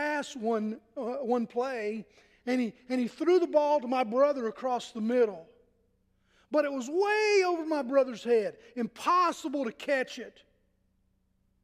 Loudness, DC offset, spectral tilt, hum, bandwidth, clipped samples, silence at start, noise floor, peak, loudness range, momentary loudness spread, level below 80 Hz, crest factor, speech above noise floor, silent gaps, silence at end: -29 LUFS; under 0.1%; -4.5 dB/octave; none; 14.5 kHz; under 0.1%; 0 s; -72 dBFS; -12 dBFS; 3 LU; 11 LU; -76 dBFS; 18 dB; 43 dB; none; 1.35 s